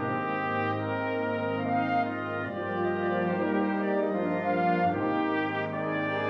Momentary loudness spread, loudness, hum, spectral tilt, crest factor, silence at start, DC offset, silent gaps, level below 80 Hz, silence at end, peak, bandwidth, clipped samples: 4 LU; -29 LUFS; none; -8.5 dB/octave; 14 dB; 0 s; under 0.1%; none; -72 dBFS; 0 s; -16 dBFS; 6.2 kHz; under 0.1%